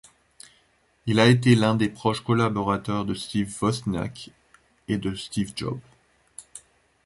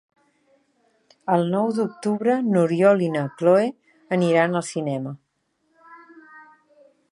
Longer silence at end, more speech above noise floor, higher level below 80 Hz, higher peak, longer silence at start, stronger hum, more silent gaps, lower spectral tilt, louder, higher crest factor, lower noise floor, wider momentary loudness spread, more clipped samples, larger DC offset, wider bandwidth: second, 0.45 s vs 0.7 s; second, 41 dB vs 50 dB; first, -52 dBFS vs -74 dBFS; about the same, -4 dBFS vs -4 dBFS; second, 1.05 s vs 1.25 s; neither; neither; about the same, -6 dB/octave vs -7 dB/octave; second, -24 LUFS vs -21 LUFS; about the same, 22 dB vs 18 dB; second, -64 dBFS vs -71 dBFS; first, 25 LU vs 10 LU; neither; neither; about the same, 11.5 kHz vs 11.5 kHz